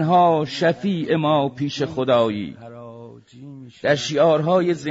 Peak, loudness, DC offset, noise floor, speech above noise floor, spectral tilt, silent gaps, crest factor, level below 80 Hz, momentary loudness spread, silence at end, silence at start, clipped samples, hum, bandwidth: -6 dBFS; -20 LUFS; under 0.1%; -41 dBFS; 22 dB; -6 dB/octave; none; 14 dB; -60 dBFS; 22 LU; 0 s; 0 s; under 0.1%; none; 7.8 kHz